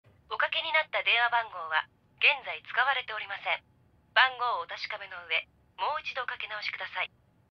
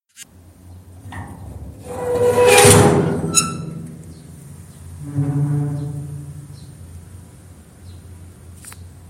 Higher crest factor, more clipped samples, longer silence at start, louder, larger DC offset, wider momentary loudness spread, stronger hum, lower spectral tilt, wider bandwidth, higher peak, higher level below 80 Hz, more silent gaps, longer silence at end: about the same, 24 dB vs 20 dB; neither; about the same, 0.3 s vs 0.2 s; second, -29 LUFS vs -15 LUFS; neither; second, 12 LU vs 29 LU; neither; second, -1.5 dB/octave vs -4 dB/octave; second, 6.8 kHz vs 16.5 kHz; second, -8 dBFS vs 0 dBFS; second, -72 dBFS vs -42 dBFS; neither; first, 0.45 s vs 0 s